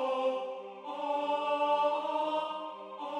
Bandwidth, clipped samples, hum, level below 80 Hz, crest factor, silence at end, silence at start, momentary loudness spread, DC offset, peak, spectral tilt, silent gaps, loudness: 10 kHz; under 0.1%; none; under -90 dBFS; 16 dB; 0 s; 0 s; 13 LU; under 0.1%; -18 dBFS; -3.5 dB/octave; none; -33 LUFS